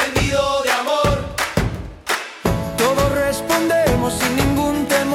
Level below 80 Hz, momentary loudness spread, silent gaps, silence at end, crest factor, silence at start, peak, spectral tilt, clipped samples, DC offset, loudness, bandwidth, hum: -32 dBFS; 6 LU; none; 0 s; 16 dB; 0 s; -2 dBFS; -4.5 dB/octave; under 0.1%; under 0.1%; -18 LUFS; 18 kHz; none